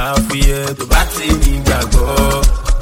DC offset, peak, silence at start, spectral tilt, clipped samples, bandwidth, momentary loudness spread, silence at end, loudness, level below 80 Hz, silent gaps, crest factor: under 0.1%; 0 dBFS; 0 s; -4.5 dB/octave; 0.1%; 17 kHz; 2 LU; 0 s; -15 LUFS; -14 dBFS; none; 12 dB